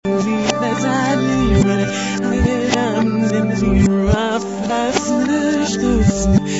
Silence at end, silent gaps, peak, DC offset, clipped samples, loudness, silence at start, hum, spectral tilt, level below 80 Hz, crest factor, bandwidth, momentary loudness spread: 0 s; none; -2 dBFS; 0.3%; under 0.1%; -17 LUFS; 0.05 s; none; -5.5 dB/octave; -28 dBFS; 14 dB; 8 kHz; 4 LU